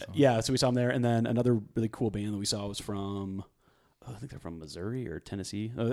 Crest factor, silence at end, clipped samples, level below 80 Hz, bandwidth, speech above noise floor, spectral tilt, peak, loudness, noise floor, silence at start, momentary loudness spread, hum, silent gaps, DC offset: 20 dB; 0 s; under 0.1%; -58 dBFS; 14.5 kHz; 37 dB; -5.5 dB/octave; -10 dBFS; -30 LUFS; -68 dBFS; 0 s; 16 LU; none; none; under 0.1%